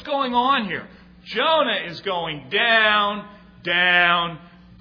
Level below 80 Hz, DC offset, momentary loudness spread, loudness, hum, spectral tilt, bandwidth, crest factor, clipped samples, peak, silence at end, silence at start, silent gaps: -56 dBFS; under 0.1%; 14 LU; -19 LUFS; none; -5.5 dB/octave; 5.4 kHz; 18 dB; under 0.1%; -2 dBFS; 0.35 s; 0 s; none